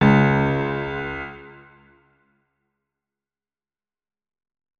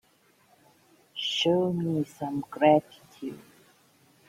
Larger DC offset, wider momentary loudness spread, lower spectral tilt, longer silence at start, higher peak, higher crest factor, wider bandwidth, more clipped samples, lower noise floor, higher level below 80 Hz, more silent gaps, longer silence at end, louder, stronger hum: neither; about the same, 18 LU vs 18 LU; first, -8.5 dB/octave vs -5.5 dB/octave; second, 0 s vs 1.15 s; first, -4 dBFS vs -8 dBFS; about the same, 22 dB vs 22 dB; second, 6.6 kHz vs 16 kHz; neither; first, under -90 dBFS vs -64 dBFS; first, -48 dBFS vs -70 dBFS; neither; first, 3.25 s vs 0.9 s; first, -21 LUFS vs -26 LUFS; neither